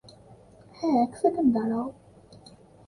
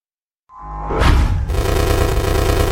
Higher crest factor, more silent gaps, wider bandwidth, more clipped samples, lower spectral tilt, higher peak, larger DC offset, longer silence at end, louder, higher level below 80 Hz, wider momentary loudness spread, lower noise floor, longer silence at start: about the same, 18 dB vs 16 dB; neither; second, 11 kHz vs 17 kHz; neither; first, -7.5 dB/octave vs -5.5 dB/octave; second, -10 dBFS vs 0 dBFS; neither; first, 0.95 s vs 0 s; second, -26 LUFS vs -17 LUFS; second, -62 dBFS vs -20 dBFS; second, 9 LU vs 14 LU; second, -52 dBFS vs -65 dBFS; first, 0.8 s vs 0.55 s